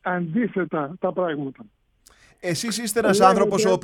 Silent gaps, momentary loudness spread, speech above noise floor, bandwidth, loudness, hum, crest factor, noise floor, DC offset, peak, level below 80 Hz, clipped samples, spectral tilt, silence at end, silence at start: none; 12 LU; 34 dB; 19 kHz; -22 LUFS; none; 20 dB; -56 dBFS; under 0.1%; -2 dBFS; -60 dBFS; under 0.1%; -4.5 dB/octave; 0.05 s; 0.05 s